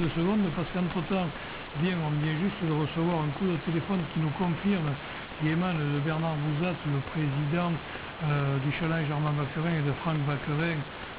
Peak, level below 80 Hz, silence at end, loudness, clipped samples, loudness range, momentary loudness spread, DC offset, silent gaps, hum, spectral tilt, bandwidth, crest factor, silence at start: -16 dBFS; -52 dBFS; 0 s; -29 LUFS; under 0.1%; 1 LU; 4 LU; under 0.1%; none; none; -6 dB/octave; 4 kHz; 12 dB; 0 s